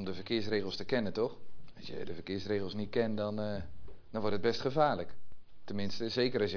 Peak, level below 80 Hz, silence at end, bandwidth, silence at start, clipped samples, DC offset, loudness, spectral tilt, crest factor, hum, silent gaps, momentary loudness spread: -14 dBFS; -60 dBFS; 0 s; 5.4 kHz; 0 s; under 0.1%; under 0.1%; -35 LUFS; -6.5 dB/octave; 20 dB; none; none; 12 LU